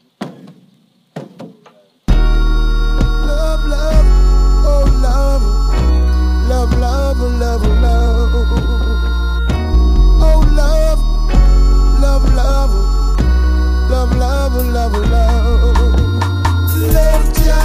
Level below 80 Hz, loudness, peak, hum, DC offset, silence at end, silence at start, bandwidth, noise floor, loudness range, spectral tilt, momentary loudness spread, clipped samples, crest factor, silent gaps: -12 dBFS; -14 LUFS; 0 dBFS; none; under 0.1%; 0 s; 0.2 s; 16 kHz; -52 dBFS; 2 LU; -6.5 dB/octave; 5 LU; under 0.1%; 10 dB; none